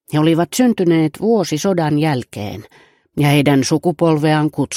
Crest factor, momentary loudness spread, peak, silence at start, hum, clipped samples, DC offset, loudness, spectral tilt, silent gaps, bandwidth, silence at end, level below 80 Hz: 16 dB; 13 LU; 0 dBFS; 0.1 s; none; under 0.1%; under 0.1%; -15 LUFS; -6 dB/octave; none; 16 kHz; 0 s; -54 dBFS